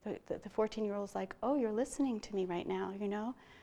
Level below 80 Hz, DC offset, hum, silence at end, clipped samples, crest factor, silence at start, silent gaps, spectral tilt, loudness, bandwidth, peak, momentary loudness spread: -66 dBFS; under 0.1%; none; 0 s; under 0.1%; 16 dB; 0.05 s; none; -6 dB/octave; -38 LUFS; 12.5 kHz; -22 dBFS; 7 LU